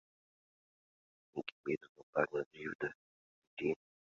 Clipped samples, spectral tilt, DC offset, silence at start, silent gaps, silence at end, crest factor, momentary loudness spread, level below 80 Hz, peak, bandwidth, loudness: under 0.1%; -4 dB/octave; under 0.1%; 1.35 s; 1.52-1.64 s, 1.89-1.95 s, 2.03-2.13 s, 2.46-2.51 s, 2.75-2.79 s, 2.95-3.57 s; 0.4 s; 26 dB; 9 LU; -78 dBFS; -18 dBFS; 7.2 kHz; -41 LUFS